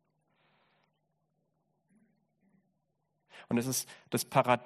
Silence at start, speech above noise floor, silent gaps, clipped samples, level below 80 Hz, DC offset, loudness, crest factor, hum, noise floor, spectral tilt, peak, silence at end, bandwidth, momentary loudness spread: 3.35 s; 49 dB; none; under 0.1%; -76 dBFS; under 0.1%; -32 LUFS; 26 dB; none; -80 dBFS; -4 dB/octave; -10 dBFS; 0 s; 13.5 kHz; 7 LU